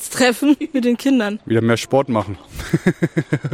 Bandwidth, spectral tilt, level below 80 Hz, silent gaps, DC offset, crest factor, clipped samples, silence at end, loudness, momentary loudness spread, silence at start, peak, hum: 16.5 kHz; -5.5 dB/octave; -44 dBFS; none; under 0.1%; 14 dB; under 0.1%; 0 s; -18 LUFS; 6 LU; 0 s; -4 dBFS; none